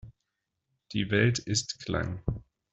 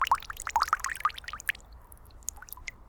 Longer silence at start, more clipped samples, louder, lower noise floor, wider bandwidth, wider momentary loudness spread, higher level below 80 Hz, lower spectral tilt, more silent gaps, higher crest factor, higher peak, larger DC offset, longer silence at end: about the same, 0.05 s vs 0 s; neither; about the same, -30 LUFS vs -32 LUFS; first, -83 dBFS vs -51 dBFS; second, 8.2 kHz vs 19.5 kHz; second, 11 LU vs 14 LU; about the same, -50 dBFS vs -52 dBFS; first, -4.5 dB/octave vs 0 dB/octave; neither; about the same, 20 dB vs 24 dB; about the same, -12 dBFS vs -10 dBFS; neither; first, 0.35 s vs 0.05 s